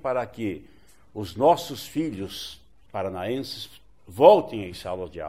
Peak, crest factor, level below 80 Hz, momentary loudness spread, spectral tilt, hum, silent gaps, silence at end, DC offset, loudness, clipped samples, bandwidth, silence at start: -2 dBFS; 24 dB; -58 dBFS; 21 LU; -5.5 dB/octave; none; none; 0 s; 0.2%; -24 LUFS; under 0.1%; 16 kHz; 0.05 s